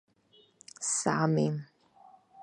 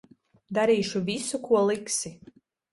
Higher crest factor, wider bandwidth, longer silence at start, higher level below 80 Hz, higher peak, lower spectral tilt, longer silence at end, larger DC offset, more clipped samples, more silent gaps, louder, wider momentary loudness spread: about the same, 22 dB vs 18 dB; about the same, 11 kHz vs 11.5 kHz; first, 0.8 s vs 0.5 s; second, -74 dBFS vs -66 dBFS; about the same, -12 dBFS vs -10 dBFS; about the same, -5 dB/octave vs -4 dB/octave; second, 0 s vs 0.55 s; neither; neither; neither; second, -30 LUFS vs -26 LUFS; first, 12 LU vs 7 LU